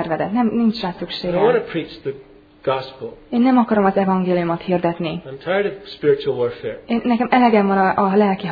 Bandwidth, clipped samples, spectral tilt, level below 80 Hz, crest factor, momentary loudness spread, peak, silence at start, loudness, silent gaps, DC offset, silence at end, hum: 5 kHz; under 0.1%; -9 dB/octave; -52 dBFS; 16 dB; 13 LU; -2 dBFS; 0 s; -19 LUFS; none; under 0.1%; 0 s; none